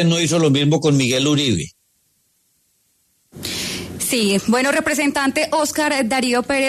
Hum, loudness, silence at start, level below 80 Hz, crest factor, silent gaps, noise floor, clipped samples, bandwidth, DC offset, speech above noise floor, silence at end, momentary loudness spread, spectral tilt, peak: none; -18 LUFS; 0 s; -52 dBFS; 14 dB; none; -63 dBFS; under 0.1%; 13.5 kHz; under 0.1%; 46 dB; 0 s; 8 LU; -4 dB/octave; -4 dBFS